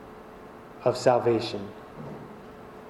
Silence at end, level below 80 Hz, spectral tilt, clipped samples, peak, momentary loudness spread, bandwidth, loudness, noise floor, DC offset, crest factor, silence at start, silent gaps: 0 s; -60 dBFS; -6 dB/octave; under 0.1%; -8 dBFS; 23 LU; 15 kHz; -26 LUFS; -46 dBFS; under 0.1%; 20 dB; 0 s; none